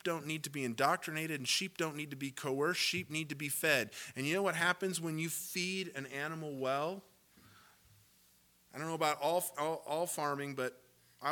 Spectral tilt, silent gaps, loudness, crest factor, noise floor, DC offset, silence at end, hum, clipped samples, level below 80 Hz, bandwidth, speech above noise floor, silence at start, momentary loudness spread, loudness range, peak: -3 dB/octave; none; -36 LUFS; 24 dB; -68 dBFS; under 0.1%; 0 s; none; under 0.1%; -82 dBFS; 19 kHz; 32 dB; 0.05 s; 9 LU; 6 LU; -14 dBFS